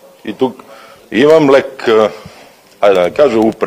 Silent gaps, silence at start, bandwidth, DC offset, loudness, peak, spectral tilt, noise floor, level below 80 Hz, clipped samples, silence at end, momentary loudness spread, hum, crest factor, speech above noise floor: none; 0.25 s; 15.5 kHz; under 0.1%; -11 LUFS; 0 dBFS; -6 dB/octave; -40 dBFS; -52 dBFS; 0.3%; 0 s; 10 LU; none; 12 dB; 30 dB